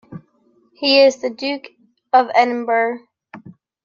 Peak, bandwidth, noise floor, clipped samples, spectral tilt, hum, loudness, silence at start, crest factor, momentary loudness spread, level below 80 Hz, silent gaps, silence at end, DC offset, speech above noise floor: -2 dBFS; 7.4 kHz; -58 dBFS; under 0.1%; -3.5 dB/octave; none; -16 LUFS; 0.1 s; 18 dB; 12 LU; -70 dBFS; none; 0.35 s; under 0.1%; 42 dB